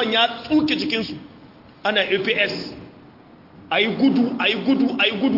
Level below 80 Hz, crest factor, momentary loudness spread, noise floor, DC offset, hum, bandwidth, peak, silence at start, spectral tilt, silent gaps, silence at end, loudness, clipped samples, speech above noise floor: -60 dBFS; 18 dB; 13 LU; -47 dBFS; under 0.1%; none; 5.8 kHz; -4 dBFS; 0 s; -5.5 dB/octave; none; 0 s; -20 LUFS; under 0.1%; 27 dB